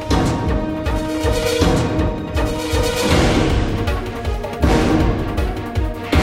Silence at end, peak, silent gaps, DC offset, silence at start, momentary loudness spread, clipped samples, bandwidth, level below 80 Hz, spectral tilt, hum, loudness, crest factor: 0 s; -2 dBFS; none; under 0.1%; 0 s; 8 LU; under 0.1%; 16.5 kHz; -22 dBFS; -5.5 dB/octave; none; -19 LUFS; 16 dB